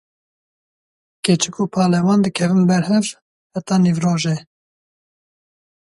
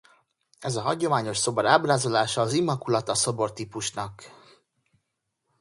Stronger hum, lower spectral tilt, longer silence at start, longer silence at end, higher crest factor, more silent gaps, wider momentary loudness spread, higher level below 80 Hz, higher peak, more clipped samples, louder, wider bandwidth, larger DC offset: neither; first, -5.5 dB/octave vs -4 dB/octave; first, 1.25 s vs 0.6 s; first, 1.55 s vs 1.3 s; second, 18 dB vs 24 dB; first, 3.22-3.50 s vs none; about the same, 11 LU vs 11 LU; about the same, -60 dBFS vs -62 dBFS; about the same, -2 dBFS vs -2 dBFS; neither; first, -17 LUFS vs -25 LUFS; about the same, 11.5 kHz vs 11.5 kHz; neither